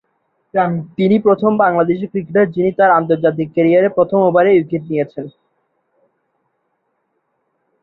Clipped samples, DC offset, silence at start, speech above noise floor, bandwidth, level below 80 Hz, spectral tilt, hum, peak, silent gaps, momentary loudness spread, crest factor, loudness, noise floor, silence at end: under 0.1%; under 0.1%; 0.55 s; 54 dB; 4.6 kHz; -60 dBFS; -10.5 dB/octave; none; -2 dBFS; none; 9 LU; 14 dB; -15 LUFS; -68 dBFS; 2.55 s